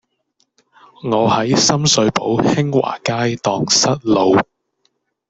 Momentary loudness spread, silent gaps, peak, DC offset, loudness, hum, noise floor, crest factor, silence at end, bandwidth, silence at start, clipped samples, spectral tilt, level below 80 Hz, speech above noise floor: 6 LU; none; -2 dBFS; under 0.1%; -15 LUFS; none; -66 dBFS; 16 dB; 0.85 s; 8.4 kHz; 1.05 s; under 0.1%; -4 dB/octave; -52 dBFS; 51 dB